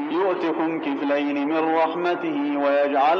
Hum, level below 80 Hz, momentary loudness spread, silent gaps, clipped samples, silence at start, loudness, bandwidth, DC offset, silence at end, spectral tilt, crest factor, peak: none; -82 dBFS; 4 LU; none; under 0.1%; 0 s; -22 LUFS; 6.4 kHz; under 0.1%; 0 s; -6.5 dB/octave; 12 dB; -10 dBFS